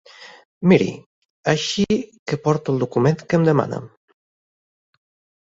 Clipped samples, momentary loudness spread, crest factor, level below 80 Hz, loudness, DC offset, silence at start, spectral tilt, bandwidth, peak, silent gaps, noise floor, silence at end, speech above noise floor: under 0.1%; 11 LU; 20 dB; -56 dBFS; -20 LUFS; under 0.1%; 0.2 s; -6 dB/octave; 7.8 kHz; -2 dBFS; 0.45-0.61 s, 1.06-1.44 s, 2.19-2.26 s; under -90 dBFS; 1.55 s; over 71 dB